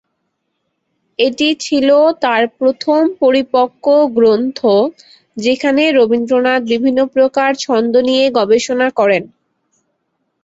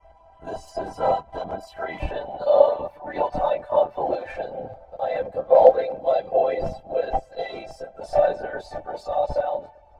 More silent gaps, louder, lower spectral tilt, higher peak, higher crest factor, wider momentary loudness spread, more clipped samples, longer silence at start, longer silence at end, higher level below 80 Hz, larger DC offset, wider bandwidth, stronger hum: neither; first, -13 LUFS vs -24 LUFS; second, -4 dB/octave vs -6.5 dB/octave; about the same, -2 dBFS vs -2 dBFS; second, 12 dB vs 22 dB; second, 5 LU vs 16 LU; neither; first, 1.2 s vs 0.4 s; first, 1.15 s vs 0.3 s; second, -58 dBFS vs -44 dBFS; neither; second, 8 kHz vs 9.6 kHz; neither